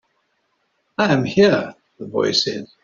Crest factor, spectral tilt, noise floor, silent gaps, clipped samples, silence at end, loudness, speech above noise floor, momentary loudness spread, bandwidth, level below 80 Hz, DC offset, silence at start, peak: 18 dB; -3.5 dB/octave; -68 dBFS; none; under 0.1%; 0.2 s; -18 LUFS; 50 dB; 17 LU; 7.6 kHz; -58 dBFS; under 0.1%; 1 s; -2 dBFS